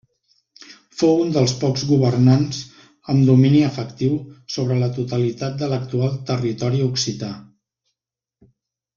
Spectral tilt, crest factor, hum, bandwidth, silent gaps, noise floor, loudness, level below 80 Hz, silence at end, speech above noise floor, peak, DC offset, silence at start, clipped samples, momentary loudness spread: -6.5 dB/octave; 18 dB; none; 7.4 kHz; none; -85 dBFS; -19 LUFS; -56 dBFS; 1.55 s; 67 dB; -2 dBFS; under 0.1%; 0.7 s; under 0.1%; 14 LU